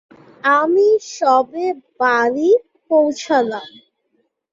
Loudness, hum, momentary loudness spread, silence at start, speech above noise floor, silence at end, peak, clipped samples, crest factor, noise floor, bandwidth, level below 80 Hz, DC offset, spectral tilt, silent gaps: -16 LUFS; none; 9 LU; 0.45 s; 51 dB; 0.85 s; -2 dBFS; under 0.1%; 16 dB; -66 dBFS; 7.6 kHz; -66 dBFS; under 0.1%; -3.5 dB/octave; none